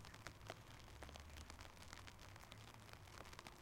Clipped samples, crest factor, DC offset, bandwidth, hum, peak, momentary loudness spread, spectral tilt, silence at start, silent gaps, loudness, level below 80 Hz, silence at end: under 0.1%; 26 dB; under 0.1%; 16.5 kHz; none; -32 dBFS; 2 LU; -3.5 dB/octave; 0 s; none; -58 LUFS; -66 dBFS; 0 s